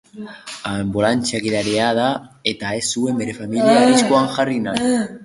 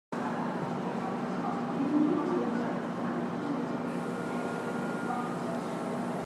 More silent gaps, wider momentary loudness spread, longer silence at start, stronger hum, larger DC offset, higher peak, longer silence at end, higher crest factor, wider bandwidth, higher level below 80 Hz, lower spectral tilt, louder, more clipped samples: neither; first, 11 LU vs 6 LU; about the same, 0.15 s vs 0.1 s; neither; neither; first, -2 dBFS vs -16 dBFS; about the same, 0 s vs 0 s; about the same, 16 dB vs 16 dB; second, 11.5 kHz vs 13 kHz; first, -52 dBFS vs -72 dBFS; second, -4 dB/octave vs -7 dB/octave; first, -18 LUFS vs -33 LUFS; neither